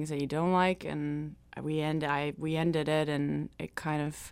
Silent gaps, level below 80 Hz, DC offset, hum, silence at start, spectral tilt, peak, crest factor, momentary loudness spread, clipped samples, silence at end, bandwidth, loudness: none; -58 dBFS; under 0.1%; none; 0 s; -6.5 dB/octave; -14 dBFS; 18 dB; 10 LU; under 0.1%; 0 s; 15.5 kHz; -32 LUFS